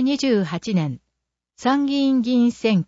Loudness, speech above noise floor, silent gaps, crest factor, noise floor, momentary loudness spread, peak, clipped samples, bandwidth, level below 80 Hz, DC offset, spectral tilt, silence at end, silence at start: -20 LUFS; 60 dB; none; 12 dB; -79 dBFS; 7 LU; -8 dBFS; under 0.1%; 8 kHz; -60 dBFS; under 0.1%; -6.5 dB/octave; 0.05 s; 0 s